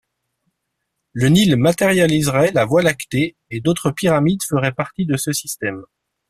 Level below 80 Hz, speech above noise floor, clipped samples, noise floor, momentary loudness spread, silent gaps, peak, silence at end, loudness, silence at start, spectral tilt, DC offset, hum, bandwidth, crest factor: -50 dBFS; 59 dB; under 0.1%; -75 dBFS; 9 LU; none; -2 dBFS; 0.45 s; -17 LUFS; 1.15 s; -5.5 dB/octave; under 0.1%; none; 15.5 kHz; 16 dB